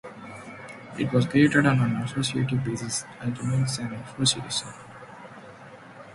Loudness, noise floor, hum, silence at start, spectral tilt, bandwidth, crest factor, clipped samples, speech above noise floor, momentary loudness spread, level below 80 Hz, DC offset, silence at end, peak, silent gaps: -25 LUFS; -46 dBFS; none; 0.05 s; -4.5 dB/octave; 11.5 kHz; 22 dB; under 0.1%; 21 dB; 24 LU; -56 dBFS; under 0.1%; 0 s; -6 dBFS; none